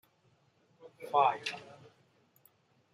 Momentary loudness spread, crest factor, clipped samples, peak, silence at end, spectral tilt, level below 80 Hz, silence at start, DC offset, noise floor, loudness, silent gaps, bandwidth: 23 LU; 24 dB; under 0.1%; -14 dBFS; 1.3 s; -3 dB/octave; -88 dBFS; 0.85 s; under 0.1%; -70 dBFS; -31 LUFS; none; 15.5 kHz